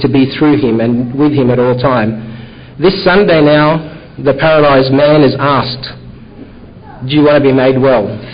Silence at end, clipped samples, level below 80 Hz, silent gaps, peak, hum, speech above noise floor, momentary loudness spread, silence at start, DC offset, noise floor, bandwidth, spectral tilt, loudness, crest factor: 0 s; under 0.1%; -38 dBFS; none; 0 dBFS; none; 23 dB; 12 LU; 0 s; under 0.1%; -32 dBFS; 5.2 kHz; -12 dB/octave; -10 LUFS; 10 dB